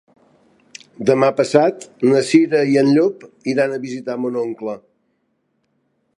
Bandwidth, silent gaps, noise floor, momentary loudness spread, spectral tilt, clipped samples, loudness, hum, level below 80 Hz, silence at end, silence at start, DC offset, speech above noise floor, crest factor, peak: 11.5 kHz; none; -68 dBFS; 12 LU; -6 dB/octave; under 0.1%; -17 LUFS; none; -68 dBFS; 1.4 s; 1 s; under 0.1%; 51 dB; 18 dB; 0 dBFS